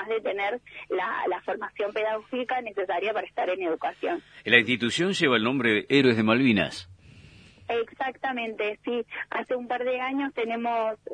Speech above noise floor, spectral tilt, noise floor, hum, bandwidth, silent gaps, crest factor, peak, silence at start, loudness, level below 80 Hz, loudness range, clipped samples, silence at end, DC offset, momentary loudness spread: 25 dB; -5 dB/octave; -51 dBFS; 50 Hz at -65 dBFS; 10.5 kHz; none; 24 dB; -2 dBFS; 0 s; -26 LUFS; -66 dBFS; 7 LU; under 0.1%; 0 s; under 0.1%; 11 LU